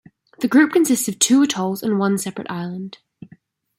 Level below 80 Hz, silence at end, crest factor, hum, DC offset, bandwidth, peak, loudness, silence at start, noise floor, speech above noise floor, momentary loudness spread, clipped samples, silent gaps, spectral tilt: -66 dBFS; 0.85 s; 18 dB; none; under 0.1%; 16.5 kHz; -2 dBFS; -18 LUFS; 0.4 s; -52 dBFS; 33 dB; 13 LU; under 0.1%; none; -4 dB/octave